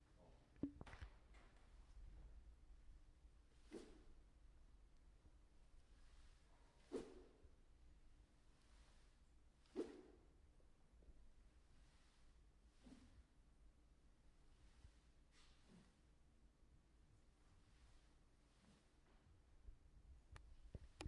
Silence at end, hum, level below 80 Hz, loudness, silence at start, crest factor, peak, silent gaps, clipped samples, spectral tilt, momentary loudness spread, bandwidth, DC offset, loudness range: 0 s; none; -68 dBFS; -59 LUFS; 0 s; 30 dB; -34 dBFS; none; under 0.1%; -6 dB/octave; 14 LU; 10.5 kHz; under 0.1%; 7 LU